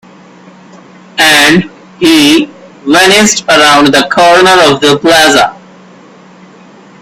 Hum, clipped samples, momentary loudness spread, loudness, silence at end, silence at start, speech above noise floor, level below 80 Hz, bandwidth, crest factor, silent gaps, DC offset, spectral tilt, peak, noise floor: none; 1%; 9 LU; -5 LUFS; 1.5 s; 1.15 s; 30 dB; -42 dBFS; over 20 kHz; 8 dB; none; under 0.1%; -2.5 dB/octave; 0 dBFS; -35 dBFS